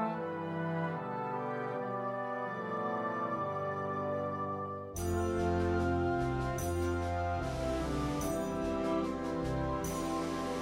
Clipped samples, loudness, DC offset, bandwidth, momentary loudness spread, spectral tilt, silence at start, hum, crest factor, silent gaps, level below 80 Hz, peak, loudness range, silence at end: under 0.1%; -35 LUFS; under 0.1%; 16 kHz; 5 LU; -6.5 dB/octave; 0 s; none; 14 dB; none; -48 dBFS; -20 dBFS; 3 LU; 0 s